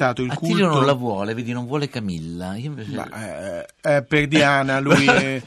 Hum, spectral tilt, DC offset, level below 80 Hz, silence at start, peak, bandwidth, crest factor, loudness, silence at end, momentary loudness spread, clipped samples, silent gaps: none; -5.5 dB/octave; under 0.1%; -52 dBFS; 0 s; -4 dBFS; 14 kHz; 16 dB; -20 LUFS; 0 s; 14 LU; under 0.1%; none